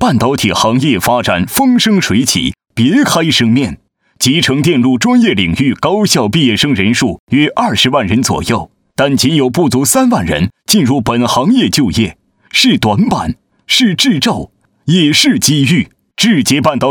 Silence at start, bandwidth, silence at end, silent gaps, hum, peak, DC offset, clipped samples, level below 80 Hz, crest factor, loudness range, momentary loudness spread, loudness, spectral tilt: 0 s; over 20 kHz; 0 s; 7.19-7.27 s; none; 0 dBFS; under 0.1%; under 0.1%; -38 dBFS; 12 dB; 1 LU; 6 LU; -11 LUFS; -4 dB/octave